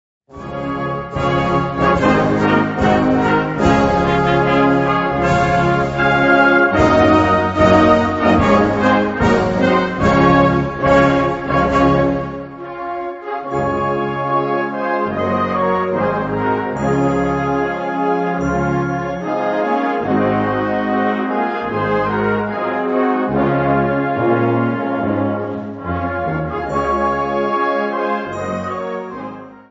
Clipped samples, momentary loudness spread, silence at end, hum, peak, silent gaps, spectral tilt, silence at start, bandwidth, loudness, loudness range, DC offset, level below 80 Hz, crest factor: under 0.1%; 10 LU; 0.1 s; none; 0 dBFS; none; -7 dB/octave; 0.3 s; 8 kHz; -16 LUFS; 6 LU; under 0.1%; -36 dBFS; 16 dB